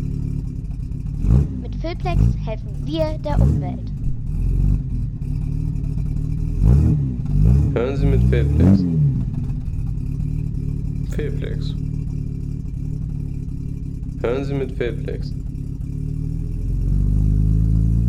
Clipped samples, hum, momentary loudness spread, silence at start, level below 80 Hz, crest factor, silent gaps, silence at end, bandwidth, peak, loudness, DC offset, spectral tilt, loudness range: under 0.1%; none; 11 LU; 0 s; -24 dBFS; 16 dB; none; 0 s; 7.6 kHz; -4 dBFS; -22 LUFS; under 0.1%; -9.5 dB/octave; 8 LU